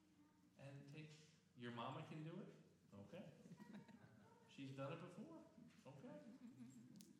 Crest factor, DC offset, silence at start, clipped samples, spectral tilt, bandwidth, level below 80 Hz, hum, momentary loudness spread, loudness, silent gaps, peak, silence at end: 20 dB; under 0.1%; 0 s; under 0.1%; -6.5 dB/octave; 12 kHz; under -90 dBFS; none; 13 LU; -59 LUFS; none; -38 dBFS; 0 s